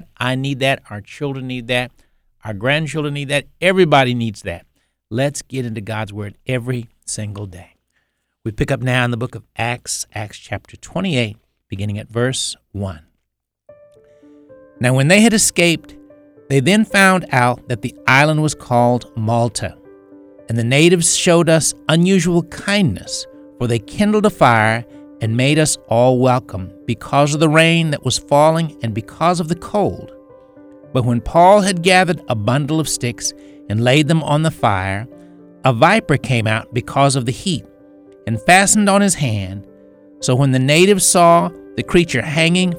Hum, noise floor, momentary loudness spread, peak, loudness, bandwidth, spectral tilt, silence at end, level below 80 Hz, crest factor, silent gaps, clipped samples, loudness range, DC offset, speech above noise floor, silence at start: none; -75 dBFS; 15 LU; 0 dBFS; -16 LUFS; 17.5 kHz; -4.5 dB/octave; 0 s; -44 dBFS; 16 dB; none; under 0.1%; 9 LU; under 0.1%; 59 dB; 0.2 s